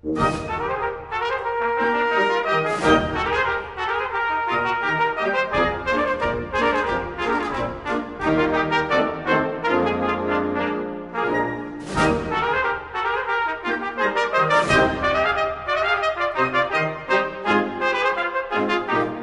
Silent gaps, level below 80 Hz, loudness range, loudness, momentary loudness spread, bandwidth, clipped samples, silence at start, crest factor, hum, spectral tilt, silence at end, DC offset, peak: none; -42 dBFS; 3 LU; -22 LUFS; 6 LU; 11.5 kHz; under 0.1%; 0.05 s; 18 dB; none; -5 dB/octave; 0 s; under 0.1%; -4 dBFS